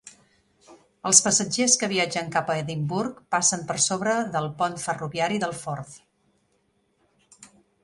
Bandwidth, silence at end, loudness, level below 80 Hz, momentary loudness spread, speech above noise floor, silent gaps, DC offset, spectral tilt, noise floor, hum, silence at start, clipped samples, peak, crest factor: 11.5 kHz; 0.35 s; -23 LUFS; -64 dBFS; 12 LU; 44 dB; none; under 0.1%; -2.5 dB/octave; -69 dBFS; none; 0.05 s; under 0.1%; 0 dBFS; 26 dB